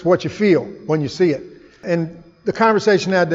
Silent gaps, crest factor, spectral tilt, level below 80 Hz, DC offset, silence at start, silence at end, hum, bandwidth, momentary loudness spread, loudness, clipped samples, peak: none; 16 dB; -6.5 dB/octave; -56 dBFS; under 0.1%; 0 s; 0 s; none; 7.8 kHz; 12 LU; -18 LUFS; under 0.1%; -2 dBFS